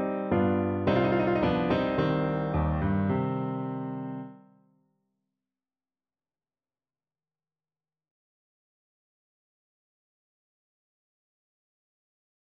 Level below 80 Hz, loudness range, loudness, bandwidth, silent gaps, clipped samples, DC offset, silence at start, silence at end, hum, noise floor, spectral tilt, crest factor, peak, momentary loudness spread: -48 dBFS; 16 LU; -28 LUFS; 5.8 kHz; none; under 0.1%; under 0.1%; 0 s; 8.05 s; none; under -90 dBFS; -9.5 dB/octave; 18 dB; -12 dBFS; 10 LU